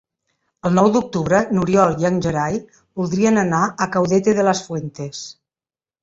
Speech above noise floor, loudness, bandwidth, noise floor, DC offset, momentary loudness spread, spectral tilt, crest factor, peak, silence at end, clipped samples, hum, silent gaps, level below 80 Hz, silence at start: over 72 dB; -18 LUFS; 7.8 kHz; under -90 dBFS; under 0.1%; 14 LU; -6 dB/octave; 18 dB; -2 dBFS; 0.7 s; under 0.1%; none; none; -50 dBFS; 0.65 s